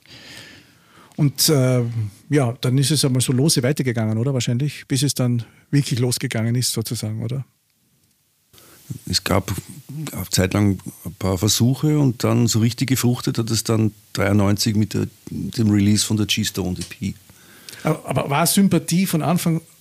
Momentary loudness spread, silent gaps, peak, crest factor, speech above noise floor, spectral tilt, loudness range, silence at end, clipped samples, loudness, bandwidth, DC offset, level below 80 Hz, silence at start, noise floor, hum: 12 LU; none; -2 dBFS; 18 dB; 43 dB; -5 dB/octave; 6 LU; 0.2 s; under 0.1%; -20 LUFS; 15.5 kHz; under 0.1%; -52 dBFS; 0.1 s; -63 dBFS; none